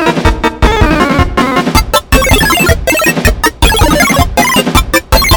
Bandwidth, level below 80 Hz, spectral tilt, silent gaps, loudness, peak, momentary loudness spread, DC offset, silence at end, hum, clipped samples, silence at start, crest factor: over 20 kHz; -16 dBFS; -4 dB/octave; none; -9 LUFS; 0 dBFS; 3 LU; 0.3%; 0 s; none; 2%; 0 s; 8 dB